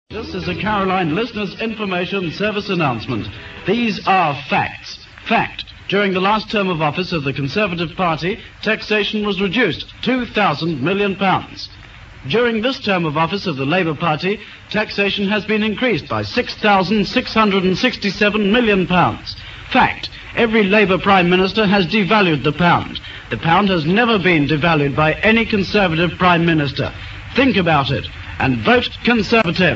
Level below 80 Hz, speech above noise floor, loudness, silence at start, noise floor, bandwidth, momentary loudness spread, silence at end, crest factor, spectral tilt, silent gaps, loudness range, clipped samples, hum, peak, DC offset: -42 dBFS; 21 dB; -17 LUFS; 0.1 s; -38 dBFS; 7.6 kHz; 10 LU; 0 s; 16 dB; -6.5 dB/octave; none; 4 LU; under 0.1%; none; 0 dBFS; under 0.1%